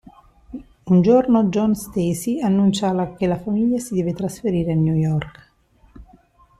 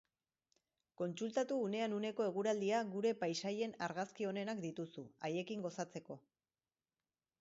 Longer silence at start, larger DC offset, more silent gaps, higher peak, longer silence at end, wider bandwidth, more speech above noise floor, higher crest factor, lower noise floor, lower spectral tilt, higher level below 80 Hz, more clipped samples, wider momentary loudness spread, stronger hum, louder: second, 0.5 s vs 1 s; neither; neither; first, -4 dBFS vs -26 dBFS; second, 0.55 s vs 1.2 s; first, 13.5 kHz vs 7.6 kHz; second, 37 dB vs over 50 dB; about the same, 16 dB vs 16 dB; second, -55 dBFS vs under -90 dBFS; first, -7.5 dB/octave vs -4.5 dB/octave; first, -48 dBFS vs -86 dBFS; neither; about the same, 11 LU vs 10 LU; neither; first, -19 LUFS vs -41 LUFS